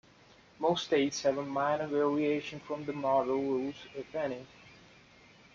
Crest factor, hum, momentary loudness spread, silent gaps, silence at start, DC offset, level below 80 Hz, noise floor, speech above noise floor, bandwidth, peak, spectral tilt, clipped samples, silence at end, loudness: 18 dB; none; 10 LU; none; 0.6 s; under 0.1%; -70 dBFS; -60 dBFS; 28 dB; 7.6 kHz; -16 dBFS; -5 dB/octave; under 0.1%; 0.8 s; -32 LUFS